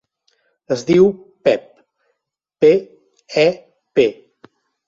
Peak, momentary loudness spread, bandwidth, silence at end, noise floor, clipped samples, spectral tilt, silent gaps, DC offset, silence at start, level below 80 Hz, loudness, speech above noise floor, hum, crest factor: -2 dBFS; 10 LU; 7.6 kHz; 0.75 s; -78 dBFS; under 0.1%; -6 dB/octave; none; under 0.1%; 0.7 s; -60 dBFS; -17 LUFS; 63 dB; none; 18 dB